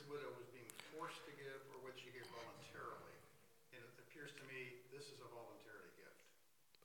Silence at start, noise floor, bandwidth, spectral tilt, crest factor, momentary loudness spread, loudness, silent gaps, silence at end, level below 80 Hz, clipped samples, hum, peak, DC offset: 0 s; -77 dBFS; 18 kHz; -3.5 dB/octave; 26 dB; 11 LU; -56 LUFS; none; 0 s; under -90 dBFS; under 0.1%; none; -32 dBFS; under 0.1%